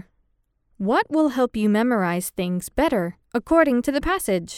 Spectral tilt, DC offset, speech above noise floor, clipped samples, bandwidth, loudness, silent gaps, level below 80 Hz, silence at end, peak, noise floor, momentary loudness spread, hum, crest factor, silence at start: -5.5 dB/octave; under 0.1%; 47 dB; under 0.1%; 17 kHz; -22 LUFS; none; -44 dBFS; 0 s; -4 dBFS; -68 dBFS; 8 LU; none; 18 dB; 0.8 s